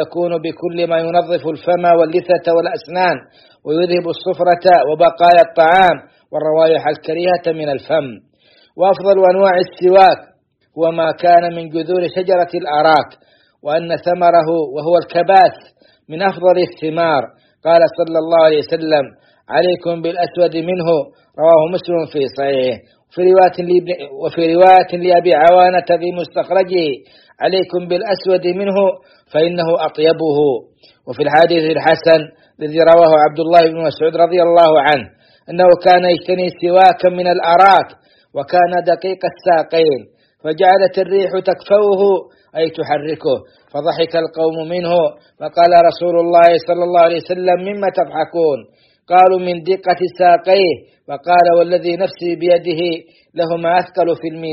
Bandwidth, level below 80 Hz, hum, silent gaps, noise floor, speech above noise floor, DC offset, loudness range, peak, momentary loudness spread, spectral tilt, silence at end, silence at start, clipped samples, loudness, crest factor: 6 kHz; -58 dBFS; none; none; -52 dBFS; 39 dB; under 0.1%; 4 LU; 0 dBFS; 11 LU; -7.5 dB/octave; 0 s; 0 s; under 0.1%; -13 LUFS; 14 dB